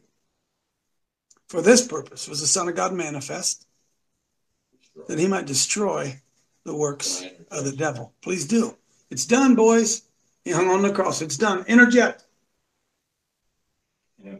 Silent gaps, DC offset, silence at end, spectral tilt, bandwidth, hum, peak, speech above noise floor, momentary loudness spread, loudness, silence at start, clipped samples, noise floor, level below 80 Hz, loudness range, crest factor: none; under 0.1%; 0 s; -3.5 dB/octave; 14.5 kHz; none; 0 dBFS; 57 dB; 16 LU; -21 LUFS; 1.5 s; under 0.1%; -78 dBFS; -68 dBFS; 7 LU; 22 dB